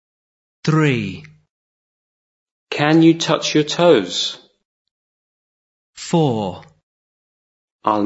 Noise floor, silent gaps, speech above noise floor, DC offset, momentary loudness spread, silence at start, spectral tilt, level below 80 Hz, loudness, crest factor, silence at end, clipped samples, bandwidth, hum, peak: under -90 dBFS; 1.50-2.46 s, 2.52-2.67 s, 4.65-4.85 s, 4.91-5.93 s, 6.83-7.79 s; over 74 dB; under 0.1%; 15 LU; 0.65 s; -5.5 dB/octave; -64 dBFS; -17 LUFS; 20 dB; 0 s; under 0.1%; 8 kHz; none; 0 dBFS